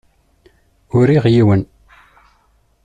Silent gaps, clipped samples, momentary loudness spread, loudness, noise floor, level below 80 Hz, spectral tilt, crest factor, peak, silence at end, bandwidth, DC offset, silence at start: none; under 0.1%; 8 LU; -14 LUFS; -57 dBFS; -48 dBFS; -9 dB/octave; 14 dB; -2 dBFS; 1.2 s; 9 kHz; under 0.1%; 0.95 s